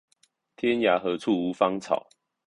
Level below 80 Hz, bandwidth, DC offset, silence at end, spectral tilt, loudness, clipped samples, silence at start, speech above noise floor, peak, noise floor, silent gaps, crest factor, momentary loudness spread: -68 dBFS; 11 kHz; under 0.1%; 0.45 s; -5.5 dB/octave; -26 LUFS; under 0.1%; 0.65 s; 43 dB; -8 dBFS; -68 dBFS; none; 20 dB; 7 LU